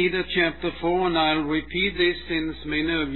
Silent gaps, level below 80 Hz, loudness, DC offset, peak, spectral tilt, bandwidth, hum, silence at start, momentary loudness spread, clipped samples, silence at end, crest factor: none; -44 dBFS; -24 LUFS; 0.6%; -8 dBFS; -8 dB/octave; 4.3 kHz; none; 0 s; 6 LU; under 0.1%; 0 s; 16 dB